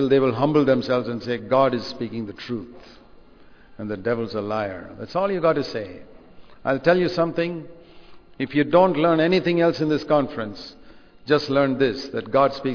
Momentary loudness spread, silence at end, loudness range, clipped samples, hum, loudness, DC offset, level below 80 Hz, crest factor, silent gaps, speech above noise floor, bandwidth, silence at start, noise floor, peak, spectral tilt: 14 LU; 0 s; 6 LU; under 0.1%; none; -22 LUFS; under 0.1%; -54 dBFS; 20 dB; none; 26 dB; 5.4 kHz; 0 s; -48 dBFS; -4 dBFS; -7.5 dB/octave